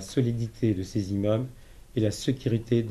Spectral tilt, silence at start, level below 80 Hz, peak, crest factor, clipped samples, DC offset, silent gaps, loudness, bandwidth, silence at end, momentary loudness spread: -7 dB/octave; 0 s; -50 dBFS; -12 dBFS; 16 dB; under 0.1%; under 0.1%; none; -28 LUFS; 13 kHz; 0 s; 4 LU